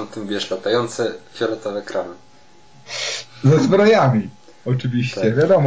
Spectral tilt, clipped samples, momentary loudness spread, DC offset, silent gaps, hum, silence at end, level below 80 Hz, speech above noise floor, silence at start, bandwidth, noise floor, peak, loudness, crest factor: -6 dB/octave; under 0.1%; 14 LU; 0.5%; none; none; 0 s; -58 dBFS; 32 dB; 0 s; 8 kHz; -50 dBFS; -6 dBFS; -19 LUFS; 14 dB